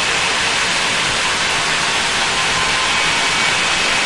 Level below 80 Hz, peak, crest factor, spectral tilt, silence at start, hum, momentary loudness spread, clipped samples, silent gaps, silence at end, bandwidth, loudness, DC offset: -42 dBFS; -4 dBFS; 12 dB; -0.5 dB/octave; 0 s; none; 1 LU; under 0.1%; none; 0 s; 11.5 kHz; -14 LUFS; 0.8%